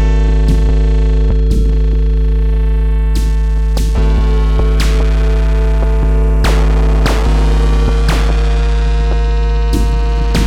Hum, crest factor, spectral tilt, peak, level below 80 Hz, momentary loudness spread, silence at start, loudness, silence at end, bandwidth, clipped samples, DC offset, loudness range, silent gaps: none; 10 dB; -6.5 dB/octave; 0 dBFS; -10 dBFS; 2 LU; 0 s; -14 LUFS; 0 s; 10.5 kHz; under 0.1%; under 0.1%; 1 LU; none